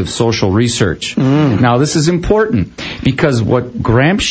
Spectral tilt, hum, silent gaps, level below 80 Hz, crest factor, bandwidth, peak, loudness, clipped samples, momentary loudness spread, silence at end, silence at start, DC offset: -5.5 dB/octave; none; none; -32 dBFS; 12 dB; 8 kHz; 0 dBFS; -13 LUFS; under 0.1%; 4 LU; 0 s; 0 s; under 0.1%